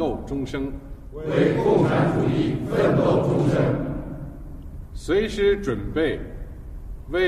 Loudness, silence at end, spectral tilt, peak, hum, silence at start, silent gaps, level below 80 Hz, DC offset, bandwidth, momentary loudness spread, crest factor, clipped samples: -22 LUFS; 0 s; -7.5 dB/octave; -6 dBFS; none; 0 s; none; -38 dBFS; under 0.1%; 13.5 kHz; 20 LU; 16 dB; under 0.1%